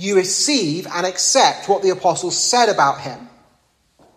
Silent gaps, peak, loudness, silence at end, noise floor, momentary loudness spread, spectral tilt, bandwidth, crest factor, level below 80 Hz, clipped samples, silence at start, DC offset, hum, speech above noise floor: none; 0 dBFS; -16 LUFS; 0.9 s; -61 dBFS; 8 LU; -2 dB/octave; 14.5 kHz; 18 dB; -64 dBFS; under 0.1%; 0 s; under 0.1%; none; 43 dB